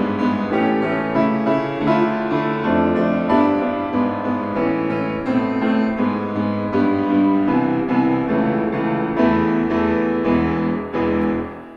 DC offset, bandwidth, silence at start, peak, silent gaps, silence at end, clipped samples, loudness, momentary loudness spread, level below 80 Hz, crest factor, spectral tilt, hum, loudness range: under 0.1%; 6.8 kHz; 0 s; -4 dBFS; none; 0 s; under 0.1%; -19 LUFS; 5 LU; -48 dBFS; 14 dB; -8.5 dB/octave; none; 2 LU